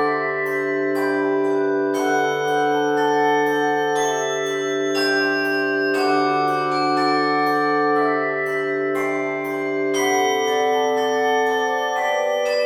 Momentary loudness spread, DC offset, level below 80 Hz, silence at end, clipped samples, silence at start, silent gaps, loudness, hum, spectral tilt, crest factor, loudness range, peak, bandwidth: 4 LU; under 0.1%; -74 dBFS; 0 s; under 0.1%; 0 s; none; -20 LUFS; none; -3.5 dB/octave; 12 dB; 1 LU; -8 dBFS; 17 kHz